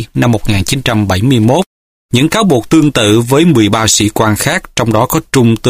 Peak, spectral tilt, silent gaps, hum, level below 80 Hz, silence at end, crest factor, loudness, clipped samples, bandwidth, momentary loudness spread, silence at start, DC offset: 0 dBFS; -5 dB/octave; 1.66-2.09 s; none; -34 dBFS; 0 s; 10 dB; -10 LUFS; under 0.1%; 16 kHz; 5 LU; 0 s; under 0.1%